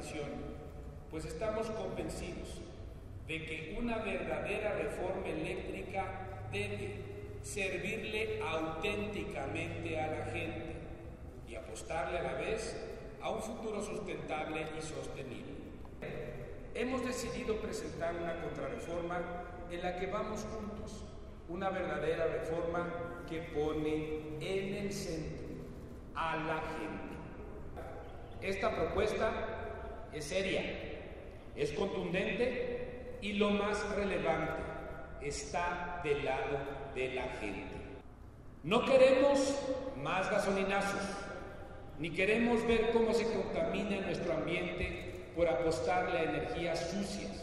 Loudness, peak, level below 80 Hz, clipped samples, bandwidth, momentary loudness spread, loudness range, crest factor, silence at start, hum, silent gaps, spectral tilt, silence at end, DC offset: -37 LUFS; -14 dBFS; -52 dBFS; under 0.1%; 13 kHz; 14 LU; 8 LU; 22 dB; 0 s; none; none; -5 dB/octave; 0 s; under 0.1%